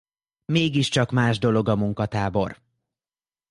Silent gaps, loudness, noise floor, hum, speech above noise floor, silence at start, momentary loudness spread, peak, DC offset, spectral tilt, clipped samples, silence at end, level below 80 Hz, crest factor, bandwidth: none; -23 LUFS; under -90 dBFS; none; over 68 dB; 0.5 s; 6 LU; -6 dBFS; under 0.1%; -6 dB/octave; under 0.1%; 0.95 s; -50 dBFS; 18 dB; 11.5 kHz